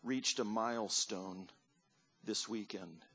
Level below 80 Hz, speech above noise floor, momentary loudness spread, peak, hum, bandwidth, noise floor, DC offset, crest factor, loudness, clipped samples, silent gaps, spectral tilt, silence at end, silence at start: -84 dBFS; 36 dB; 15 LU; -22 dBFS; none; 8 kHz; -76 dBFS; under 0.1%; 20 dB; -38 LUFS; under 0.1%; none; -2 dB/octave; 0.15 s; 0.05 s